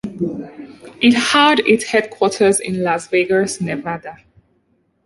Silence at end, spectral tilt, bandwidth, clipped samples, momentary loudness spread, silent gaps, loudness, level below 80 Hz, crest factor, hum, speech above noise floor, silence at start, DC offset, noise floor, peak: 0.9 s; -3.5 dB/octave; 11.5 kHz; under 0.1%; 17 LU; none; -16 LUFS; -56 dBFS; 16 dB; none; 47 dB; 0.05 s; under 0.1%; -62 dBFS; 0 dBFS